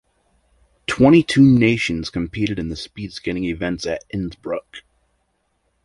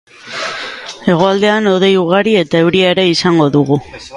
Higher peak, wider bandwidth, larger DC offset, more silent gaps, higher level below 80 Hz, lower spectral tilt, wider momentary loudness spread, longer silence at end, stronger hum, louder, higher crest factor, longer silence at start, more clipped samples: about the same, -2 dBFS vs 0 dBFS; about the same, 11.5 kHz vs 11.5 kHz; neither; neither; first, -44 dBFS vs -50 dBFS; about the same, -6.5 dB/octave vs -5.5 dB/octave; first, 16 LU vs 11 LU; first, 1.05 s vs 0 s; neither; second, -19 LUFS vs -12 LUFS; first, 18 dB vs 12 dB; first, 0.9 s vs 0.25 s; neither